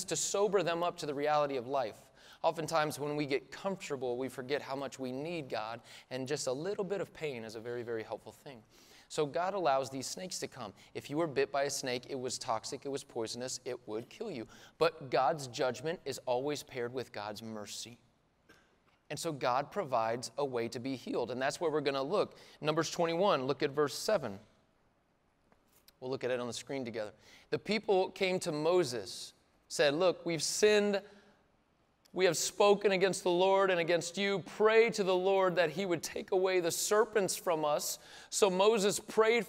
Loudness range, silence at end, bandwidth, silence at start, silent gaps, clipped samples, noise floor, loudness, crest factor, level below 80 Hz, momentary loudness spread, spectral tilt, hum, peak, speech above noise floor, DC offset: 9 LU; 0 s; 16 kHz; 0 s; none; under 0.1%; -73 dBFS; -33 LUFS; 20 dB; -74 dBFS; 14 LU; -3.5 dB/octave; none; -14 dBFS; 40 dB; under 0.1%